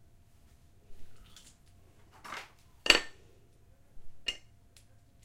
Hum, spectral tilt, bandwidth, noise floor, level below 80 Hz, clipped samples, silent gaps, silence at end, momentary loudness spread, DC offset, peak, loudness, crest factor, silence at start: none; -0.5 dB/octave; 16 kHz; -60 dBFS; -56 dBFS; under 0.1%; none; 0.8 s; 29 LU; under 0.1%; -4 dBFS; -30 LUFS; 36 dB; 0.9 s